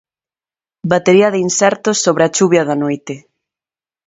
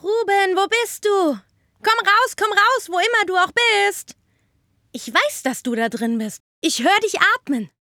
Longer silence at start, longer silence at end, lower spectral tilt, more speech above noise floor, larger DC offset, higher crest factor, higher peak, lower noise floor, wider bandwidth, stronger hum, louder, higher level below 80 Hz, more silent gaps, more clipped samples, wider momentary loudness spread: first, 0.85 s vs 0.05 s; first, 0.9 s vs 0.15 s; first, -4 dB/octave vs -2 dB/octave; first, over 77 dB vs 45 dB; neither; about the same, 16 dB vs 18 dB; about the same, 0 dBFS vs -2 dBFS; first, under -90 dBFS vs -64 dBFS; second, 8 kHz vs 19.5 kHz; neither; first, -13 LUFS vs -18 LUFS; first, -58 dBFS vs -68 dBFS; second, none vs 6.40-6.62 s; neither; first, 14 LU vs 10 LU